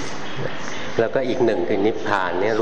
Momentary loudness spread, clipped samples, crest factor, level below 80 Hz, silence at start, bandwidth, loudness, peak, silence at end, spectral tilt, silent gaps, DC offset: 9 LU; under 0.1%; 18 dB; -54 dBFS; 0 s; 9.2 kHz; -22 LUFS; -4 dBFS; 0 s; -5.5 dB/octave; none; 5%